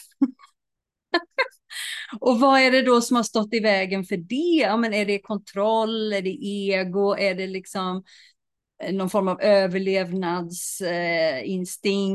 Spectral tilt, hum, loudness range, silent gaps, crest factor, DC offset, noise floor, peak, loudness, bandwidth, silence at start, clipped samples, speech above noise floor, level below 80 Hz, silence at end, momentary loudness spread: -4.5 dB/octave; none; 5 LU; none; 16 dB; under 0.1%; -84 dBFS; -6 dBFS; -23 LUFS; 12.5 kHz; 0 s; under 0.1%; 62 dB; -72 dBFS; 0 s; 11 LU